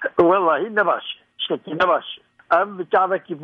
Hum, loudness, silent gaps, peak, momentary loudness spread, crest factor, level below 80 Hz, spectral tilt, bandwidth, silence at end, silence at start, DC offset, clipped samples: none; -20 LUFS; none; -4 dBFS; 12 LU; 16 dB; -62 dBFS; -6.5 dB/octave; 6.2 kHz; 0 s; 0 s; under 0.1%; under 0.1%